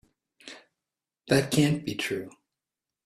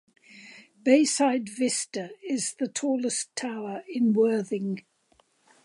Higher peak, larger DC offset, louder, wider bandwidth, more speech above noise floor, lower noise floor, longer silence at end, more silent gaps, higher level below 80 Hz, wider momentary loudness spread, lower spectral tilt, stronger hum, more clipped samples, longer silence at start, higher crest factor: about the same, -8 dBFS vs -8 dBFS; neither; about the same, -27 LUFS vs -26 LUFS; first, 15.5 kHz vs 11.5 kHz; first, 63 dB vs 40 dB; first, -89 dBFS vs -66 dBFS; about the same, 0.75 s vs 0.85 s; neither; first, -62 dBFS vs -82 dBFS; first, 22 LU vs 13 LU; about the same, -5 dB/octave vs -4 dB/octave; neither; neither; about the same, 0.45 s vs 0.35 s; about the same, 22 dB vs 20 dB